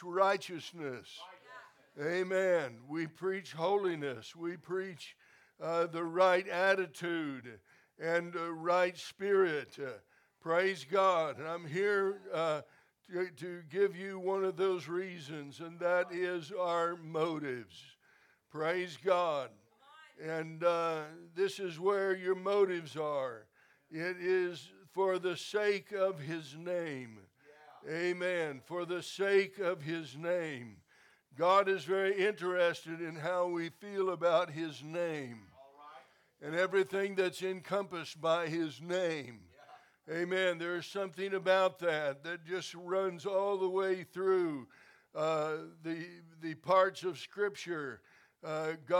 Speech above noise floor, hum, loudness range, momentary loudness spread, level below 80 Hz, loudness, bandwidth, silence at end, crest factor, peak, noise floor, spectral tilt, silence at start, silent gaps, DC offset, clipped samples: 34 dB; none; 4 LU; 15 LU; -90 dBFS; -35 LUFS; 14.5 kHz; 0 s; 20 dB; -14 dBFS; -68 dBFS; -5 dB/octave; 0 s; none; under 0.1%; under 0.1%